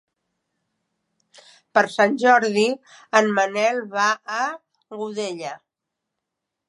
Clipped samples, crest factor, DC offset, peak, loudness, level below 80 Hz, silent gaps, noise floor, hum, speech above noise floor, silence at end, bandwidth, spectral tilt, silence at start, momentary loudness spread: under 0.1%; 22 dB; under 0.1%; -2 dBFS; -20 LUFS; -80 dBFS; none; -83 dBFS; none; 62 dB; 1.15 s; 11.5 kHz; -3.5 dB/octave; 1.75 s; 16 LU